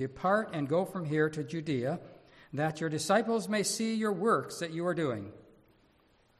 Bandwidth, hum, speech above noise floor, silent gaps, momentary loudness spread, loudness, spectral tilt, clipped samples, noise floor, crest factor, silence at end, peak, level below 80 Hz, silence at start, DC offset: 14 kHz; none; 36 dB; none; 9 LU; -32 LUFS; -5 dB/octave; under 0.1%; -67 dBFS; 18 dB; 1 s; -14 dBFS; -68 dBFS; 0 s; under 0.1%